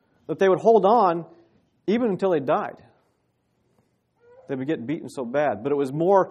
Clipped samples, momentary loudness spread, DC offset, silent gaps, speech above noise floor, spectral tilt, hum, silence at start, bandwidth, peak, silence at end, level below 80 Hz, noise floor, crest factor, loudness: under 0.1%; 14 LU; under 0.1%; none; 48 dB; -7.5 dB/octave; none; 0.3 s; 10 kHz; -6 dBFS; 0 s; -72 dBFS; -70 dBFS; 18 dB; -22 LUFS